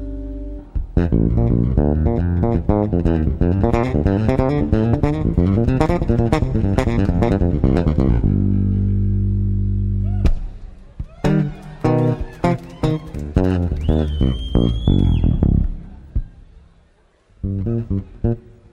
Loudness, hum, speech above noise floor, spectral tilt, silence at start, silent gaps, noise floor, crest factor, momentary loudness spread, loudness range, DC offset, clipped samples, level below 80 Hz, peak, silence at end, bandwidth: -19 LUFS; none; 39 dB; -9 dB/octave; 0 s; none; -55 dBFS; 16 dB; 10 LU; 4 LU; under 0.1%; under 0.1%; -24 dBFS; -2 dBFS; 0.35 s; 8.8 kHz